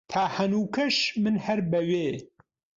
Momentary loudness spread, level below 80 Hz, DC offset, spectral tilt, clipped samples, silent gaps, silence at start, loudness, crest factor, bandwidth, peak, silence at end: 4 LU; -64 dBFS; under 0.1%; -5 dB/octave; under 0.1%; none; 0.1 s; -26 LUFS; 16 dB; 7.6 kHz; -12 dBFS; 0.5 s